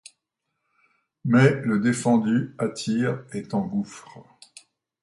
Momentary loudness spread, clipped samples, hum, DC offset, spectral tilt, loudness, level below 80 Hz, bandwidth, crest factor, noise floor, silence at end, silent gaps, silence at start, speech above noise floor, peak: 14 LU; under 0.1%; none; under 0.1%; -6.5 dB/octave; -23 LUFS; -64 dBFS; 11.5 kHz; 20 dB; -80 dBFS; 0.8 s; none; 1.25 s; 57 dB; -6 dBFS